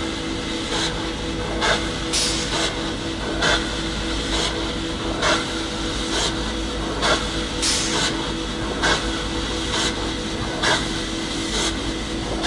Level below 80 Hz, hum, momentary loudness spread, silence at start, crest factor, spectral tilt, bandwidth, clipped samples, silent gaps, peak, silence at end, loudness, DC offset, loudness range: -34 dBFS; none; 6 LU; 0 s; 18 dB; -3 dB/octave; 11.5 kHz; under 0.1%; none; -6 dBFS; 0 s; -22 LUFS; under 0.1%; 1 LU